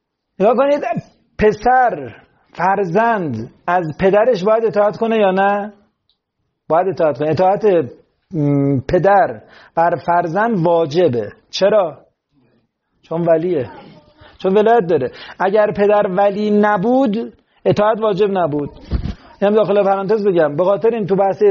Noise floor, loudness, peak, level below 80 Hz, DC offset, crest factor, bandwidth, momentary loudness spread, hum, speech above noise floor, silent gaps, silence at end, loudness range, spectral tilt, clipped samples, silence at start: -72 dBFS; -16 LUFS; -2 dBFS; -40 dBFS; under 0.1%; 14 dB; 7 kHz; 11 LU; none; 57 dB; none; 0 s; 3 LU; -5.5 dB/octave; under 0.1%; 0.4 s